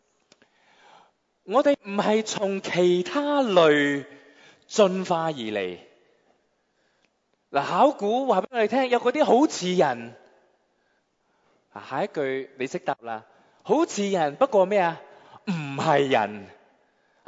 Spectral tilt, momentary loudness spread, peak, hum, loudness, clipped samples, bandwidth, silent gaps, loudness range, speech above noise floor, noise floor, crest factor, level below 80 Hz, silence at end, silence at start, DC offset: -5 dB/octave; 13 LU; -6 dBFS; none; -24 LUFS; under 0.1%; 8 kHz; none; 7 LU; 47 dB; -70 dBFS; 20 dB; -76 dBFS; 0.8 s; 1.5 s; under 0.1%